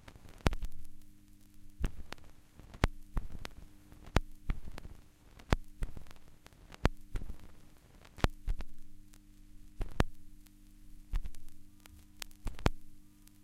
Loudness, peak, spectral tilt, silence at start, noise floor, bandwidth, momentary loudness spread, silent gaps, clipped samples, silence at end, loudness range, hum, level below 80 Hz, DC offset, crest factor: -40 LUFS; -4 dBFS; -5.5 dB/octave; 0 s; -57 dBFS; 16.5 kHz; 24 LU; none; under 0.1%; 0 s; 4 LU; none; -42 dBFS; under 0.1%; 34 dB